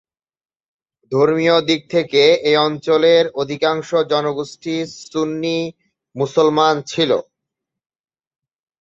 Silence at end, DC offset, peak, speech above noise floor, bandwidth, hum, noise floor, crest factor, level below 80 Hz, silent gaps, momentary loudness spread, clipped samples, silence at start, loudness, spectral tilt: 1.6 s; under 0.1%; -2 dBFS; 65 dB; 7.8 kHz; none; -82 dBFS; 16 dB; -62 dBFS; none; 11 LU; under 0.1%; 1.1 s; -17 LUFS; -5 dB/octave